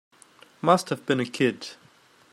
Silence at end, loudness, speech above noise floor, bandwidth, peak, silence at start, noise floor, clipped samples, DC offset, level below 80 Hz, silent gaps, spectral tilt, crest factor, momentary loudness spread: 0.6 s; -25 LUFS; 33 dB; 15.5 kHz; -6 dBFS; 0.65 s; -57 dBFS; under 0.1%; under 0.1%; -72 dBFS; none; -5 dB/octave; 22 dB; 13 LU